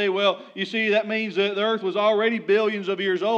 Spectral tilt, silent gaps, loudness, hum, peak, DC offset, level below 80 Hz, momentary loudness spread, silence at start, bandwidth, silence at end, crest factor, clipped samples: -5.5 dB/octave; none; -23 LUFS; none; -8 dBFS; under 0.1%; under -90 dBFS; 5 LU; 0 s; 7.8 kHz; 0 s; 14 dB; under 0.1%